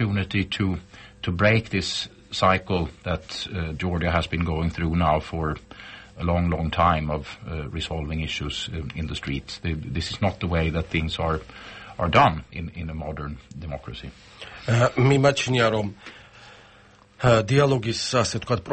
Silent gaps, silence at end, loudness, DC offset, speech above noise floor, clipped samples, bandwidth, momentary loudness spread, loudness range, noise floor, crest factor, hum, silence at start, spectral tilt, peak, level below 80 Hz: none; 0 s; -24 LUFS; under 0.1%; 29 dB; under 0.1%; 8.8 kHz; 16 LU; 5 LU; -53 dBFS; 20 dB; none; 0 s; -5.5 dB/octave; -4 dBFS; -40 dBFS